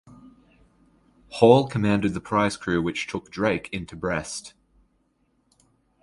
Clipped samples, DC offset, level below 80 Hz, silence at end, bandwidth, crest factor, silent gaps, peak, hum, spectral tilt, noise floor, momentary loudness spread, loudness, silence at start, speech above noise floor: under 0.1%; under 0.1%; -52 dBFS; 1.55 s; 11.5 kHz; 24 dB; none; -2 dBFS; none; -6 dB/octave; -68 dBFS; 16 LU; -23 LUFS; 0.1 s; 45 dB